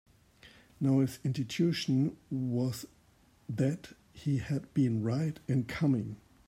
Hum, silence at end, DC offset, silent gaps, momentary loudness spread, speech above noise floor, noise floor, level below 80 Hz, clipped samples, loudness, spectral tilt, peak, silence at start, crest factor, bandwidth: none; 0.3 s; under 0.1%; none; 13 LU; 33 dB; -64 dBFS; -64 dBFS; under 0.1%; -32 LUFS; -7 dB/octave; -18 dBFS; 0.45 s; 14 dB; 16 kHz